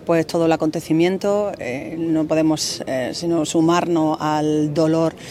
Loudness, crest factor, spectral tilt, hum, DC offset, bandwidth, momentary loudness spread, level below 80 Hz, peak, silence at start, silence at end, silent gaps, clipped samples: -19 LUFS; 14 dB; -5.5 dB/octave; none; under 0.1%; 15 kHz; 6 LU; -56 dBFS; -4 dBFS; 0 s; 0 s; none; under 0.1%